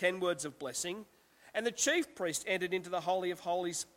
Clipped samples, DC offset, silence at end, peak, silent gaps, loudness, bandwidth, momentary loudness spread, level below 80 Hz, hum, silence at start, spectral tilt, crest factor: under 0.1%; under 0.1%; 0.15 s; -18 dBFS; none; -35 LUFS; 16.5 kHz; 8 LU; -74 dBFS; none; 0 s; -2.5 dB/octave; 18 dB